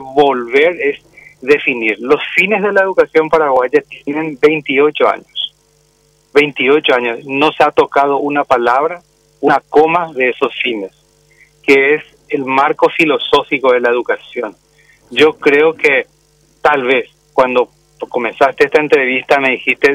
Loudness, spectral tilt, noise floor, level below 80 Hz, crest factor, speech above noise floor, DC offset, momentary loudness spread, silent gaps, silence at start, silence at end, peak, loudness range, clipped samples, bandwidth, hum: -13 LUFS; -5 dB/octave; -54 dBFS; -54 dBFS; 14 dB; 41 dB; under 0.1%; 10 LU; none; 0 s; 0 s; 0 dBFS; 2 LU; under 0.1%; 12 kHz; none